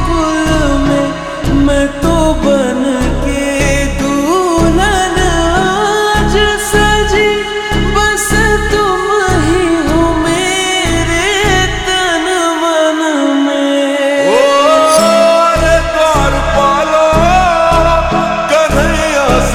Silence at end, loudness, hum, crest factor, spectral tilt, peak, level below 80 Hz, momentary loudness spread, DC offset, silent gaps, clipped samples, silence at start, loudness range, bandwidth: 0 s; -11 LUFS; none; 10 dB; -4 dB/octave; 0 dBFS; -20 dBFS; 5 LU; under 0.1%; none; under 0.1%; 0 s; 3 LU; 20 kHz